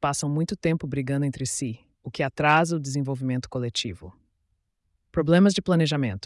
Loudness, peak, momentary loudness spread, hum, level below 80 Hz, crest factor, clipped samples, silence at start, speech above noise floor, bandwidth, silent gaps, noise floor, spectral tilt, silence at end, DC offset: -25 LUFS; -8 dBFS; 12 LU; none; -54 dBFS; 16 dB; under 0.1%; 0 s; 50 dB; 12 kHz; none; -74 dBFS; -5.5 dB/octave; 0 s; under 0.1%